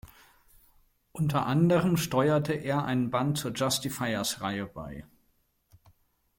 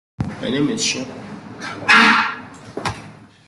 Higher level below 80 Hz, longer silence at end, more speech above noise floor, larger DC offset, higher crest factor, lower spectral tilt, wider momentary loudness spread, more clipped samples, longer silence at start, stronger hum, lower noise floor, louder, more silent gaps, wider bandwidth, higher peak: second, -58 dBFS vs -50 dBFS; first, 1.35 s vs 0.2 s; first, 43 dB vs 24 dB; neither; about the same, 18 dB vs 20 dB; first, -5.5 dB/octave vs -3 dB/octave; second, 15 LU vs 23 LU; neither; second, 0.05 s vs 0.2 s; neither; first, -71 dBFS vs -40 dBFS; second, -28 LUFS vs -17 LUFS; neither; first, 16.5 kHz vs 12 kHz; second, -12 dBFS vs 0 dBFS